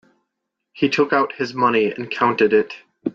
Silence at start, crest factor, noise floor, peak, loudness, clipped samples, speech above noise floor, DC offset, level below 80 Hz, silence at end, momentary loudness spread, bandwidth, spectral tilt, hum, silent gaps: 0.75 s; 16 dB; -79 dBFS; -4 dBFS; -19 LUFS; under 0.1%; 60 dB; under 0.1%; -64 dBFS; 0.05 s; 6 LU; 7.4 kHz; -6 dB/octave; none; none